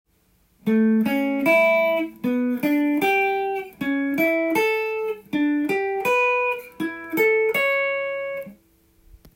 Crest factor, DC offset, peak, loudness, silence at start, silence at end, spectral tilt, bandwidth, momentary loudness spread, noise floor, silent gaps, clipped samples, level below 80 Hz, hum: 16 dB; under 0.1%; -6 dBFS; -21 LUFS; 0.65 s; 0.2 s; -5.5 dB/octave; 16.5 kHz; 9 LU; -62 dBFS; none; under 0.1%; -62 dBFS; none